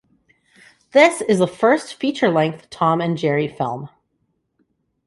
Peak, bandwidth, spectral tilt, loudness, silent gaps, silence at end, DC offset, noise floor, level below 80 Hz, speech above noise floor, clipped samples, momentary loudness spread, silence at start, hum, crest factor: -2 dBFS; 11.5 kHz; -5.5 dB/octave; -18 LUFS; none; 1.2 s; under 0.1%; -70 dBFS; -64 dBFS; 52 dB; under 0.1%; 11 LU; 0.95 s; none; 18 dB